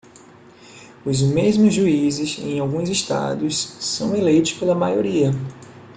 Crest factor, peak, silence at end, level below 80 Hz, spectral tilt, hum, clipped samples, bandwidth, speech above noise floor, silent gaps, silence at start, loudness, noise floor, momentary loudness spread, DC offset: 16 dB; -4 dBFS; 0.05 s; -54 dBFS; -5.5 dB/octave; none; under 0.1%; 9.6 kHz; 27 dB; none; 0.7 s; -20 LUFS; -46 dBFS; 8 LU; under 0.1%